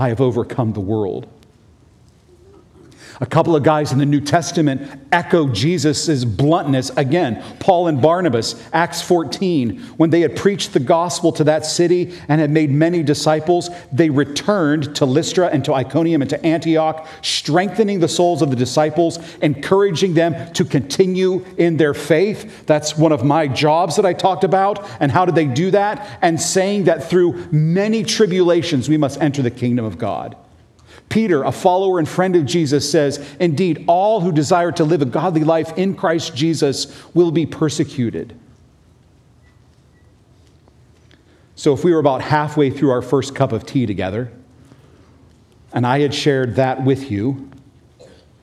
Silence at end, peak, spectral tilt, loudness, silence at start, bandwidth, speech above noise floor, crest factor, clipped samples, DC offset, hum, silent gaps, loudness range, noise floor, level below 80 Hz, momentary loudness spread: 0.95 s; 0 dBFS; -5.5 dB/octave; -17 LUFS; 0 s; 13.5 kHz; 34 dB; 16 dB; under 0.1%; under 0.1%; none; none; 5 LU; -50 dBFS; -54 dBFS; 6 LU